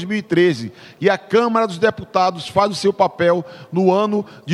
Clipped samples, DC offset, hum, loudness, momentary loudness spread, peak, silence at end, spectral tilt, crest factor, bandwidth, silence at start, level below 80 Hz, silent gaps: under 0.1%; under 0.1%; none; -18 LUFS; 6 LU; -2 dBFS; 0 s; -6 dB/octave; 16 dB; 12 kHz; 0 s; -58 dBFS; none